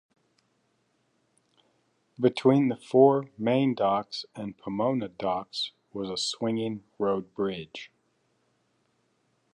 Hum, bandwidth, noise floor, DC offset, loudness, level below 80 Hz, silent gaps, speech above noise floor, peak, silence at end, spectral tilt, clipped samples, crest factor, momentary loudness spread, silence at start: none; 10.5 kHz; -72 dBFS; under 0.1%; -27 LUFS; -70 dBFS; none; 45 dB; -6 dBFS; 1.65 s; -6 dB/octave; under 0.1%; 22 dB; 15 LU; 2.2 s